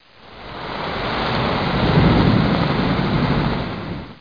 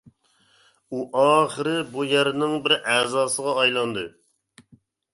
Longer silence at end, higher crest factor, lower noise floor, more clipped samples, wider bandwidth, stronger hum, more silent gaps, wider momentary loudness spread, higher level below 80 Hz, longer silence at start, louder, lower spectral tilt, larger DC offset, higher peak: second, 0.05 s vs 1.05 s; about the same, 16 dB vs 20 dB; second, -39 dBFS vs -62 dBFS; neither; second, 5.2 kHz vs 11.5 kHz; neither; neither; first, 15 LU vs 12 LU; first, -32 dBFS vs -68 dBFS; second, 0.25 s vs 0.9 s; first, -19 LUFS vs -22 LUFS; first, -8 dB/octave vs -3 dB/octave; first, 0.3% vs under 0.1%; about the same, -4 dBFS vs -4 dBFS